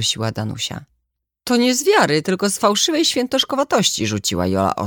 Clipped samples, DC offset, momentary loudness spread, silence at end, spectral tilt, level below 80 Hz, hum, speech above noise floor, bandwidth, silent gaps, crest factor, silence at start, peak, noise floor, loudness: under 0.1%; under 0.1%; 9 LU; 0 s; -3.5 dB/octave; -52 dBFS; none; 57 dB; 19 kHz; none; 16 dB; 0 s; -2 dBFS; -75 dBFS; -18 LUFS